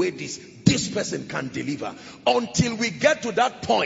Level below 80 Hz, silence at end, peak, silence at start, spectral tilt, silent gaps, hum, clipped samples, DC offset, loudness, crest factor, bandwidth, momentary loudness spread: -54 dBFS; 0 s; -2 dBFS; 0 s; -4.5 dB/octave; none; none; under 0.1%; under 0.1%; -24 LUFS; 22 dB; 8 kHz; 10 LU